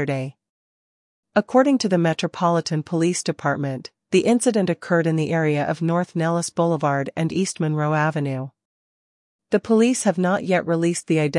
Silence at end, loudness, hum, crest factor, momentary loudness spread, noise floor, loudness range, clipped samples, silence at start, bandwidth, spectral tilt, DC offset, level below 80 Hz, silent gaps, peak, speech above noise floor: 0 s; -21 LUFS; none; 18 dB; 7 LU; under -90 dBFS; 2 LU; under 0.1%; 0 s; 11.5 kHz; -5.5 dB/octave; under 0.1%; -68 dBFS; 0.49-1.23 s, 8.65-9.39 s; -4 dBFS; over 70 dB